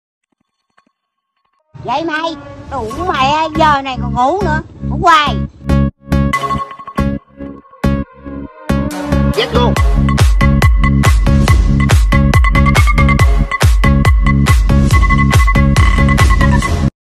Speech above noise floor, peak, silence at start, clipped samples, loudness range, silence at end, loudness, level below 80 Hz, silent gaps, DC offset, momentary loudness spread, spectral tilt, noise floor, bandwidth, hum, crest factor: 57 dB; 0 dBFS; 1.75 s; under 0.1%; 7 LU; 0.15 s; -12 LUFS; -16 dBFS; none; under 0.1%; 11 LU; -6 dB/octave; -70 dBFS; 13.5 kHz; none; 12 dB